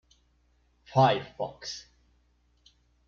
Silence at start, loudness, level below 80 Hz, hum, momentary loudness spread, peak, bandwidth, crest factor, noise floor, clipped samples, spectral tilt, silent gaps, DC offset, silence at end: 0.9 s; -28 LUFS; -64 dBFS; 60 Hz at -60 dBFS; 16 LU; -10 dBFS; 7.4 kHz; 22 dB; -68 dBFS; under 0.1%; -5.5 dB/octave; none; under 0.1%; 1.25 s